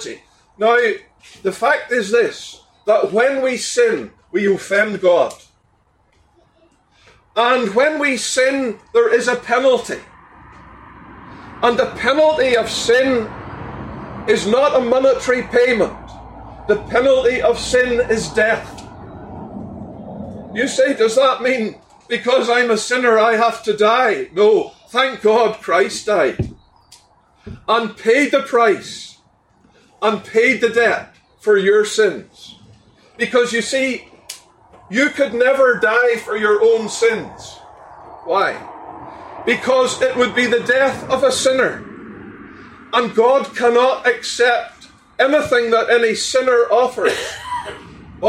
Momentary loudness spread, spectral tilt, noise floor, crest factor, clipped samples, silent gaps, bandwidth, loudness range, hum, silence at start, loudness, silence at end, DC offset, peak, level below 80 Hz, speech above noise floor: 18 LU; -3.5 dB/octave; -58 dBFS; 14 dB; under 0.1%; none; 13 kHz; 4 LU; none; 0 s; -16 LUFS; 0 s; under 0.1%; -2 dBFS; -48 dBFS; 43 dB